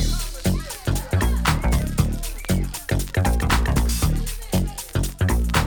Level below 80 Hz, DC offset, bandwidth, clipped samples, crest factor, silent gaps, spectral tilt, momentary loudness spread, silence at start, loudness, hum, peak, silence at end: -24 dBFS; under 0.1%; over 20 kHz; under 0.1%; 16 dB; none; -5 dB/octave; 6 LU; 0 s; -23 LUFS; none; -4 dBFS; 0 s